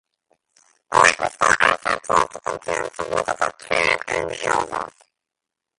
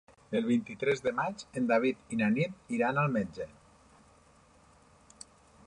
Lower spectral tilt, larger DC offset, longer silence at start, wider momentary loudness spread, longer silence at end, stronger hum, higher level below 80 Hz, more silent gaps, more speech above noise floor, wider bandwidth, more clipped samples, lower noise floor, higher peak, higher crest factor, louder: second, -2 dB/octave vs -6.5 dB/octave; neither; first, 0.9 s vs 0.3 s; second, 10 LU vs 18 LU; second, 0.9 s vs 2.2 s; neither; first, -54 dBFS vs -66 dBFS; neither; first, 63 dB vs 31 dB; about the same, 11.5 kHz vs 10.5 kHz; neither; first, -85 dBFS vs -61 dBFS; first, 0 dBFS vs -14 dBFS; about the same, 22 dB vs 18 dB; first, -20 LUFS vs -31 LUFS